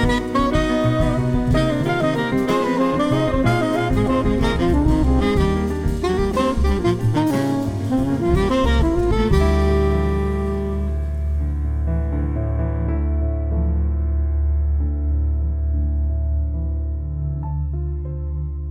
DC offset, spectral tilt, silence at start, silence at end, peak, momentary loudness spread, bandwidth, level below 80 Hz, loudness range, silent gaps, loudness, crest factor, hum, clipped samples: under 0.1%; -7.5 dB/octave; 0 s; 0 s; -4 dBFS; 7 LU; 11.5 kHz; -22 dBFS; 4 LU; none; -20 LUFS; 14 dB; none; under 0.1%